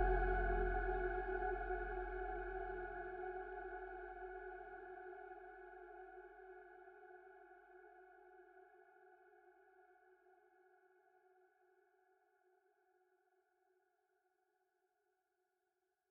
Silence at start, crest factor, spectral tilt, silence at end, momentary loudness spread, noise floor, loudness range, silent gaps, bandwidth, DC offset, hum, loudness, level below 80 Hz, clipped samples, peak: 0 s; 22 dB; -6 dB/octave; 6.2 s; 24 LU; -88 dBFS; 23 LU; none; 3.9 kHz; under 0.1%; none; -45 LUFS; -52 dBFS; under 0.1%; -26 dBFS